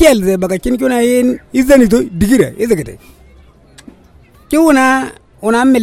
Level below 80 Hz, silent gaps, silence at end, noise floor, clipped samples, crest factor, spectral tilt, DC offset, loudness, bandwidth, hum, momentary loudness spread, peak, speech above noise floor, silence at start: -34 dBFS; none; 0 s; -43 dBFS; 0.2%; 12 dB; -5 dB/octave; under 0.1%; -12 LUFS; 16.5 kHz; none; 8 LU; 0 dBFS; 33 dB; 0 s